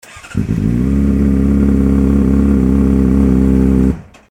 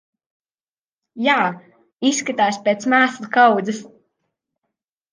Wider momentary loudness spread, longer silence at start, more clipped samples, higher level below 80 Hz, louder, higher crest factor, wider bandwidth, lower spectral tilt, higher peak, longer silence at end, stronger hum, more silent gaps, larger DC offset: second, 6 LU vs 10 LU; second, 0.15 s vs 1.15 s; neither; first, -18 dBFS vs -76 dBFS; first, -13 LUFS vs -18 LUFS; second, 12 dB vs 18 dB; about the same, 10 kHz vs 10 kHz; first, -9.5 dB/octave vs -3.5 dB/octave; about the same, 0 dBFS vs -2 dBFS; second, 0.25 s vs 1.25 s; neither; second, none vs 1.93-1.97 s; first, 0.3% vs under 0.1%